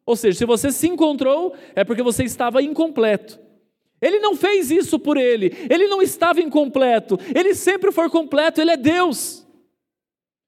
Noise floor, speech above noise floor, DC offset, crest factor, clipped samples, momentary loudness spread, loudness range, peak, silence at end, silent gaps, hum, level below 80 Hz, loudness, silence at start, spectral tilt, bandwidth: under -90 dBFS; over 72 dB; under 0.1%; 14 dB; under 0.1%; 4 LU; 3 LU; -4 dBFS; 1.1 s; none; none; -58 dBFS; -18 LUFS; 0.05 s; -4 dB/octave; 16 kHz